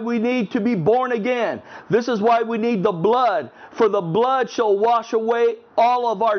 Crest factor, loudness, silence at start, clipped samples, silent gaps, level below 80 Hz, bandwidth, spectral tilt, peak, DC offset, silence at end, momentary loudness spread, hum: 14 dB; -19 LUFS; 0 s; under 0.1%; none; -66 dBFS; 6.6 kHz; -6.5 dB/octave; -4 dBFS; under 0.1%; 0 s; 4 LU; none